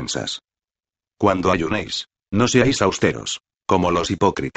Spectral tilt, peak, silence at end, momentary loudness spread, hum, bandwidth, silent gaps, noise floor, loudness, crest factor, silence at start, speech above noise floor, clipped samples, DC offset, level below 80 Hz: -4.5 dB/octave; 0 dBFS; 0.05 s; 12 LU; none; 9 kHz; none; under -90 dBFS; -20 LUFS; 20 dB; 0 s; over 71 dB; under 0.1%; under 0.1%; -46 dBFS